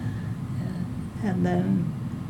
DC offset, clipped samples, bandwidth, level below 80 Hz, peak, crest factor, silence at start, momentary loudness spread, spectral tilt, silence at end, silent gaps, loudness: under 0.1%; under 0.1%; 16 kHz; -48 dBFS; -12 dBFS; 14 dB; 0 s; 8 LU; -8.5 dB/octave; 0 s; none; -28 LUFS